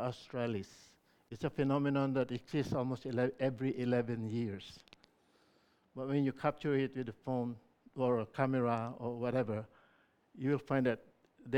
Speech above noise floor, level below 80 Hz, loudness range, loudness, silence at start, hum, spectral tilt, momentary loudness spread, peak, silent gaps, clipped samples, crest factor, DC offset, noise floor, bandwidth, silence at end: 36 dB; -70 dBFS; 3 LU; -36 LUFS; 0 s; none; -8 dB/octave; 11 LU; -16 dBFS; none; under 0.1%; 20 dB; under 0.1%; -72 dBFS; 10.5 kHz; 0 s